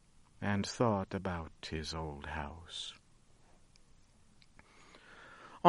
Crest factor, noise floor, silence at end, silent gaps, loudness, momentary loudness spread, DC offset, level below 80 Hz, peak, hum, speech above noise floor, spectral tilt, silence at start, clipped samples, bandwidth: 30 dB; -63 dBFS; 0 s; none; -38 LUFS; 25 LU; under 0.1%; -56 dBFS; -8 dBFS; none; 25 dB; -5.5 dB/octave; 0.4 s; under 0.1%; 11.5 kHz